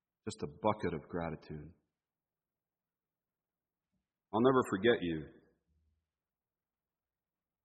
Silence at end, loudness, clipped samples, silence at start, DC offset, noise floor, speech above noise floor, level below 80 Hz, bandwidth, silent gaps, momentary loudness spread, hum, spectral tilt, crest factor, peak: 2.35 s; -34 LUFS; under 0.1%; 0.25 s; under 0.1%; under -90 dBFS; over 56 dB; -66 dBFS; 4.3 kHz; none; 18 LU; none; -5 dB/octave; 24 dB; -16 dBFS